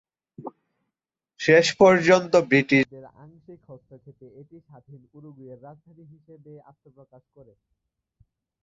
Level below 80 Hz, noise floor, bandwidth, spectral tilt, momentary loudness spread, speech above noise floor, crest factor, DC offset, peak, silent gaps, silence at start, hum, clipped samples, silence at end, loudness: -66 dBFS; -86 dBFS; 8 kHz; -5 dB/octave; 28 LU; 62 dB; 22 dB; under 0.1%; -4 dBFS; none; 0.45 s; none; under 0.1%; 3.1 s; -19 LUFS